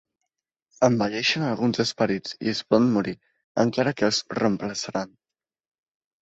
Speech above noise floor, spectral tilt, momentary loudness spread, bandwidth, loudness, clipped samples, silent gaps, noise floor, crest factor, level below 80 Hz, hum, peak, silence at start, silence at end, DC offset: over 66 dB; -5 dB/octave; 10 LU; 8.2 kHz; -24 LUFS; under 0.1%; 3.44-3.55 s; under -90 dBFS; 20 dB; -62 dBFS; none; -6 dBFS; 0.8 s; 1.15 s; under 0.1%